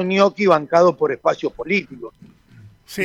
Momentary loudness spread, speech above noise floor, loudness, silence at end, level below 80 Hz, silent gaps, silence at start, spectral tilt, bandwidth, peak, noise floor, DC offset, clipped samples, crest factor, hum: 21 LU; 29 dB; -18 LUFS; 0 s; -58 dBFS; none; 0 s; -6 dB/octave; 16 kHz; -2 dBFS; -46 dBFS; under 0.1%; under 0.1%; 16 dB; none